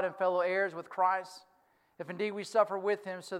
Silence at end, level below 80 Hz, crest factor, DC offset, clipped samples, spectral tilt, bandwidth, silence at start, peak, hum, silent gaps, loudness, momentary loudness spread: 0 s; -90 dBFS; 18 dB; under 0.1%; under 0.1%; -4.5 dB/octave; 13.5 kHz; 0 s; -14 dBFS; none; none; -32 LUFS; 11 LU